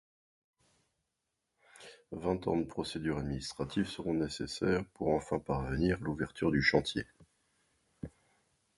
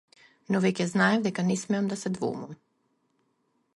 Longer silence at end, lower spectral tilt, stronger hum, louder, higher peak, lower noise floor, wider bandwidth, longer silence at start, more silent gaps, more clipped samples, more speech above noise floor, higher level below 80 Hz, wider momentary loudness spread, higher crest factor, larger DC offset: second, 0.7 s vs 1.25 s; about the same, -6 dB/octave vs -5.5 dB/octave; neither; second, -34 LUFS vs -27 LUFS; second, -12 dBFS vs -8 dBFS; first, -85 dBFS vs -73 dBFS; about the same, 11.5 kHz vs 11.5 kHz; first, 1.75 s vs 0.5 s; neither; neither; first, 52 dB vs 46 dB; first, -52 dBFS vs -72 dBFS; first, 20 LU vs 9 LU; about the same, 24 dB vs 20 dB; neither